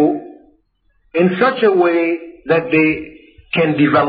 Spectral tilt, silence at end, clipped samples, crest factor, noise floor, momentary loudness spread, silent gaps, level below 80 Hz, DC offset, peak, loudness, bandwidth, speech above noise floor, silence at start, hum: -5 dB/octave; 0 s; under 0.1%; 12 dB; -61 dBFS; 12 LU; none; -54 dBFS; under 0.1%; -2 dBFS; -16 LUFS; 5 kHz; 47 dB; 0 s; none